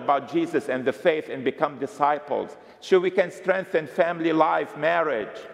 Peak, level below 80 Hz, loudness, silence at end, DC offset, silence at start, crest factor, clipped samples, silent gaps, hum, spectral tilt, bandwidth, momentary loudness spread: -6 dBFS; -76 dBFS; -24 LUFS; 0 s; under 0.1%; 0 s; 18 dB; under 0.1%; none; none; -6 dB/octave; 12.5 kHz; 8 LU